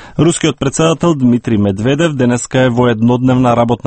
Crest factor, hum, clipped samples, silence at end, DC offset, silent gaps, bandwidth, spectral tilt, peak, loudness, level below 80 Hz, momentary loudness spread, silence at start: 12 dB; none; under 0.1%; 0.1 s; under 0.1%; none; 8.8 kHz; -6 dB/octave; 0 dBFS; -12 LUFS; -40 dBFS; 3 LU; 0 s